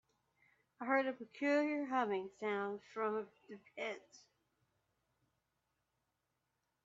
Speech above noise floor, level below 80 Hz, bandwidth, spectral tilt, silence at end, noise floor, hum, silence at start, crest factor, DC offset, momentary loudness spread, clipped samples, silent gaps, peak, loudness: 47 dB; -88 dBFS; 7.8 kHz; -3 dB/octave; 2.7 s; -86 dBFS; none; 0.8 s; 22 dB; under 0.1%; 15 LU; under 0.1%; none; -20 dBFS; -39 LUFS